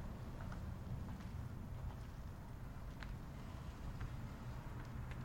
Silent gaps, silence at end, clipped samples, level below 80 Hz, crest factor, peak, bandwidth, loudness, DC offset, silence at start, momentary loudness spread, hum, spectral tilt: none; 0 s; under 0.1%; -52 dBFS; 16 dB; -32 dBFS; 16.5 kHz; -50 LUFS; under 0.1%; 0 s; 4 LU; none; -7 dB/octave